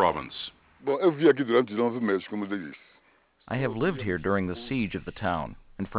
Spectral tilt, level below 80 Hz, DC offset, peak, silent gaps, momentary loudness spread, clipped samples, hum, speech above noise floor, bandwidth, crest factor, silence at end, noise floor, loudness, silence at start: -10.5 dB/octave; -52 dBFS; under 0.1%; -8 dBFS; none; 14 LU; under 0.1%; none; 37 dB; 4 kHz; 20 dB; 0 s; -64 dBFS; -28 LUFS; 0 s